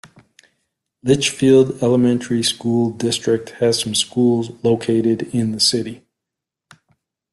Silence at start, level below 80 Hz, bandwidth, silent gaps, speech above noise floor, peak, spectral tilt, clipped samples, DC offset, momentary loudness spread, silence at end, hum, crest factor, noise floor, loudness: 1.05 s; -56 dBFS; 12.5 kHz; none; 67 dB; -2 dBFS; -4.5 dB/octave; under 0.1%; under 0.1%; 7 LU; 1.35 s; none; 16 dB; -84 dBFS; -17 LUFS